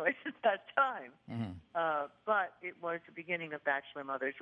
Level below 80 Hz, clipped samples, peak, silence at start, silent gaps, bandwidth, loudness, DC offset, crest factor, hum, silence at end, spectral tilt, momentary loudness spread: -80 dBFS; under 0.1%; -14 dBFS; 0 s; none; 5.6 kHz; -36 LUFS; under 0.1%; 22 dB; none; 0 s; -7.5 dB/octave; 10 LU